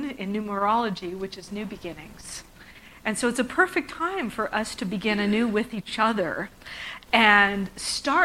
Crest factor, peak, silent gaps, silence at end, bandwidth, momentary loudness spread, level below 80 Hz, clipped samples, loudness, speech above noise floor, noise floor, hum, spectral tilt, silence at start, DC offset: 22 dB; -2 dBFS; none; 0 s; 16 kHz; 17 LU; -54 dBFS; under 0.1%; -24 LUFS; 23 dB; -48 dBFS; none; -3.5 dB/octave; 0 s; under 0.1%